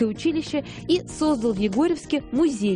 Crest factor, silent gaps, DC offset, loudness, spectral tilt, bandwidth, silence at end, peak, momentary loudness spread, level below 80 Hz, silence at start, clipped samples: 14 dB; none; under 0.1%; -24 LUFS; -5.5 dB/octave; 10.5 kHz; 0 s; -8 dBFS; 5 LU; -48 dBFS; 0 s; under 0.1%